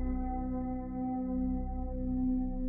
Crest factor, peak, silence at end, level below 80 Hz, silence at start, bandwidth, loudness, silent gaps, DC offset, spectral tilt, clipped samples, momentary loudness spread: 10 dB; -24 dBFS; 0 s; -38 dBFS; 0 s; 2.2 kHz; -35 LUFS; none; under 0.1%; -13 dB/octave; under 0.1%; 5 LU